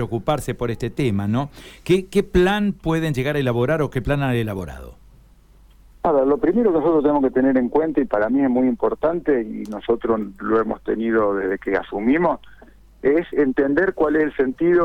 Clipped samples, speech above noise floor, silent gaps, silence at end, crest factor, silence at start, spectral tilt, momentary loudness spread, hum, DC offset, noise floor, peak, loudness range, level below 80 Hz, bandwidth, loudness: under 0.1%; 30 dB; none; 0 s; 14 dB; 0 s; -7.5 dB/octave; 7 LU; none; under 0.1%; -50 dBFS; -6 dBFS; 3 LU; -42 dBFS; 16 kHz; -20 LUFS